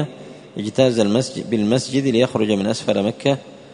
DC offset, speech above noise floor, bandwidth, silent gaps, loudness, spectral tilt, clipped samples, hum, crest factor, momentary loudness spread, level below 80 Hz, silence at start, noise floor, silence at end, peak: under 0.1%; 20 dB; 11 kHz; none; -19 LUFS; -5.5 dB/octave; under 0.1%; none; 18 dB; 11 LU; -58 dBFS; 0 s; -38 dBFS; 0 s; -2 dBFS